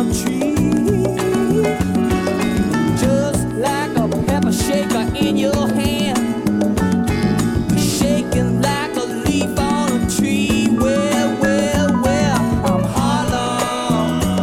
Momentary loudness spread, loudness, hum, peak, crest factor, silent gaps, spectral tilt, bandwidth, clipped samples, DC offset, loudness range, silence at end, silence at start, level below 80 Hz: 3 LU; -17 LUFS; none; -4 dBFS; 14 dB; none; -5.5 dB/octave; 17 kHz; under 0.1%; under 0.1%; 1 LU; 0 s; 0 s; -34 dBFS